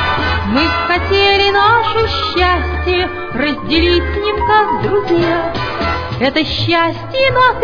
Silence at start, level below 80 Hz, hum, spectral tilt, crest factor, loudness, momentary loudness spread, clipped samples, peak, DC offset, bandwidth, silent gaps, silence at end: 0 s; -28 dBFS; none; -6.5 dB/octave; 12 dB; -13 LUFS; 7 LU; under 0.1%; 0 dBFS; under 0.1%; 5.4 kHz; none; 0 s